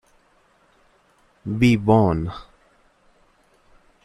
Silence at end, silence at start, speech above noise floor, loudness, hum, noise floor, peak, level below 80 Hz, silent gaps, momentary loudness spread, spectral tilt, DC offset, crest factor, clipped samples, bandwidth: 1.6 s; 1.45 s; 42 dB; -19 LUFS; none; -60 dBFS; -4 dBFS; -46 dBFS; none; 20 LU; -7.5 dB/octave; under 0.1%; 20 dB; under 0.1%; 12 kHz